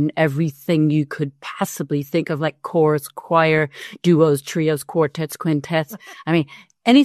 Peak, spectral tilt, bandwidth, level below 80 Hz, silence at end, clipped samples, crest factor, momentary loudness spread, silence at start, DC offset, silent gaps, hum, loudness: -2 dBFS; -6.5 dB/octave; 13.5 kHz; -64 dBFS; 0 s; under 0.1%; 16 dB; 10 LU; 0 s; under 0.1%; none; none; -20 LUFS